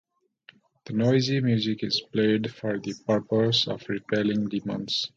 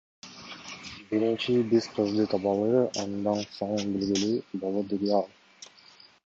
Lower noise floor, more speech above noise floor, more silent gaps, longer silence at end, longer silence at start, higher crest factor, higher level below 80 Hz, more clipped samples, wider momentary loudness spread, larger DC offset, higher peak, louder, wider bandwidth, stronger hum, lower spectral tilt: about the same, -57 dBFS vs -55 dBFS; about the same, 32 dB vs 29 dB; neither; second, 0.1 s vs 0.6 s; first, 0.85 s vs 0.25 s; about the same, 16 dB vs 18 dB; about the same, -64 dBFS vs -64 dBFS; neither; second, 8 LU vs 19 LU; neither; about the same, -10 dBFS vs -10 dBFS; about the same, -26 LUFS vs -28 LUFS; about the same, 7.6 kHz vs 7.8 kHz; neither; about the same, -6 dB/octave vs -5.5 dB/octave